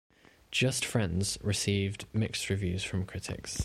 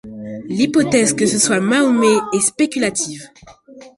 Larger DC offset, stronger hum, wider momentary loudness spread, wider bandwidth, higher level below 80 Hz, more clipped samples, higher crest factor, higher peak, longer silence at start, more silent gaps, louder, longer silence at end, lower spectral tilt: neither; neither; second, 7 LU vs 12 LU; first, 15.5 kHz vs 11.5 kHz; about the same, -52 dBFS vs -54 dBFS; neither; about the same, 18 dB vs 16 dB; second, -14 dBFS vs -2 dBFS; first, 0.5 s vs 0.05 s; neither; second, -32 LUFS vs -16 LUFS; about the same, 0 s vs 0.1 s; about the same, -4 dB/octave vs -3.5 dB/octave